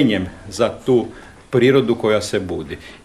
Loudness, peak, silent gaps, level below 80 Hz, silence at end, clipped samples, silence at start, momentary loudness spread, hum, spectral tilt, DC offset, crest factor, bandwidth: -18 LUFS; -2 dBFS; none; -46 dBFS; 0.1 s; under 0.1%; 0 s; 14 LU; none; -6 dB/octave; 0.1%; 18 dB; 13 kHz